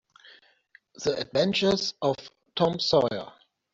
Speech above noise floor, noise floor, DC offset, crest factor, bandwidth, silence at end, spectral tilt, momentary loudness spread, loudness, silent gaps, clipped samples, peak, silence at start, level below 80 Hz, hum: 35 dB; -60 dBFS; under 0.1%; 18 dB; 8 kHz; 0.45 s; -4.5 dB/octave; 13 LU; -26 LUFS; none; under 0.1%; -10 dBFS; 1 s; -62 dBFS; none